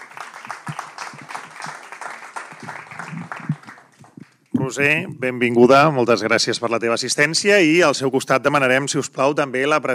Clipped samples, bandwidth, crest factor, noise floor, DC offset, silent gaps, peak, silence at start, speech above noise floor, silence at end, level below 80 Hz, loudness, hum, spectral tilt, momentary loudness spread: under 0.1%; 15.5 kHz; 18 dB; -45 dBFS; under 0.1%; none; 0 dBFS; 0 s; 28 dB; 0 s; -72 dBFS; -17 LUFS; none; -4 dB/octave; 20 LU